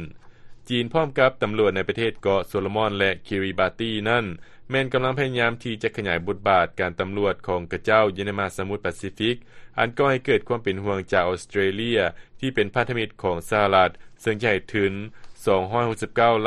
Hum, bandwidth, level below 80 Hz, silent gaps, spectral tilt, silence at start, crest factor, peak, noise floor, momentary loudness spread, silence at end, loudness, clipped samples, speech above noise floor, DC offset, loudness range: none; 12 kHz; -52 dBFS; none; -6 dB/octave; 0 s; 20 dB; -2 dBFS; -42 dBFS; 8 LU; 0 s; -23 LUFS; under 0.1%; 19 dB; under 0.1%; 2 LU